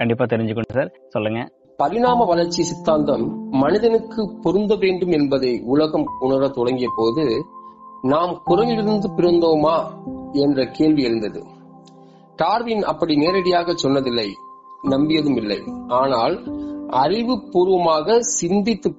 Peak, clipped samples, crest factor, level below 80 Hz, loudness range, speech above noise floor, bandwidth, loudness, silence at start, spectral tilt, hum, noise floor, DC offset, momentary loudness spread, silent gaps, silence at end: -4 dBFS; under 0.1%; 14 dB; -50 dBFS; 2 LU; 27 dB; 8 kHz; -19 LUFS; 0 s; -5 dB/octave; none; -46 dBFS; under 0.1%; 9 LU; none; 0.05 s